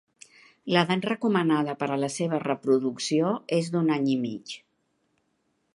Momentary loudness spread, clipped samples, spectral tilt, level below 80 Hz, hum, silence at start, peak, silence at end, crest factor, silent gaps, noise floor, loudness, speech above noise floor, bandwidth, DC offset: 9 LU; under 0.1%; -5.5 dB/octave; -74 dBFS; none; 0.65 s; -4 dBFS; 1.2 s; 22 dB; none; -73 dBFS; -26 LUFS; 48 dB; 11.5 kHz; under 0.1%